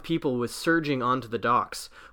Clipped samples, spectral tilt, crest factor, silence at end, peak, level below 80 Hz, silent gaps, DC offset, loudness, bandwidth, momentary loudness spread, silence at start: under 0.1%; -5 dB/octave; 16 dB; 0.05 s; -10 dBFS; -56 dBFS; none; under 0.1%; -26 LUFS; 18.5 kHz; 6 LU; 0 s